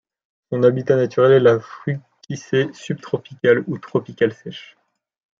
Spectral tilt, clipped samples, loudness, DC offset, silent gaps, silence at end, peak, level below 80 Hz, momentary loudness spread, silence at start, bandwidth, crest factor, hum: -7 dB/octave; under 0.1%; -19 LUFS; under 0.1%; none; 0.75 s; -2 dBFS; -66 dBFS; 17 LU; 0.5 s; 7.6 kHz; 18 dB; none